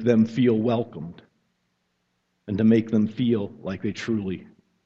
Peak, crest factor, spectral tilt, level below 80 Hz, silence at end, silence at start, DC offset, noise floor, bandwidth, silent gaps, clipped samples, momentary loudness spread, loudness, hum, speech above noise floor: -6 dBFS; 18 dB; -8 dB/octave; -62 dBFS; 0.4 s; 0 s; under 0.1%; -73 dBFS; 7.4 kHz; none; under 0.1%; 14 LU; -24 LUFS; none; 51 dB